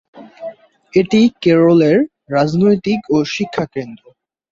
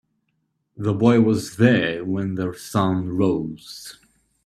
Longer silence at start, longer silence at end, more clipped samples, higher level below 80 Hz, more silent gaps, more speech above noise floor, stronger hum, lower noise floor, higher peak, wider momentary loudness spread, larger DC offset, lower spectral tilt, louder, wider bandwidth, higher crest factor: second, 0.15 s vs 0.8 s; about the same, 0.55 s vs 0.55 s; neither; about the same, -54 dBFS vs -56 dBFS; neither; second, 19 dB vs 52 dB; neither; second, -33 dBFS vs -72 dBFS; about the same, -2 dBFS vs -2 dBFS; first, 21 LU vs 18 LU; neither; about the same, -7 dB/octave vs -6.5 dB/octave; first, -14 LUFS vs -21 LUFS; second, 7.6 kHz vs 13.5 kHz; second, 14 dB vs 20 dB